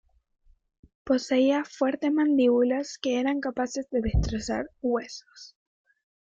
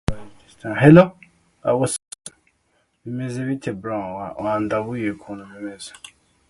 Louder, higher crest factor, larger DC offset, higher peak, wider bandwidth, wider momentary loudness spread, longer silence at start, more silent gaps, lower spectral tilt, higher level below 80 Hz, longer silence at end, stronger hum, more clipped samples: second, -26 LUFS vs -20 LUFS; second, 16 dB vs 22 dB; neither; second, -12 dBFS vs 0 dBFS; second, 7.8 kHz vs 11.5 kHz; second, 9 LU vs 25 LU; first, 1.05 s vs 0.1 s; neither; about the same, -6 dB/octave vs -6.5 dB/octave; about the same, -40 dBFS vs -44 dBFS; first, 0.8 s vs 0.6 s; neither; neither